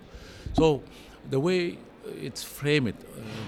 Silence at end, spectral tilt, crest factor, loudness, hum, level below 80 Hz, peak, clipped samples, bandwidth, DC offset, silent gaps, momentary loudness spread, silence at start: 0 s; -6 dB/octave; 18 dB; -28 LUFS; none; -46 dBFS; -10 dBFS; under 0.1%; 17.5 kHz; under 0.1%; none; 19 LU; 0 s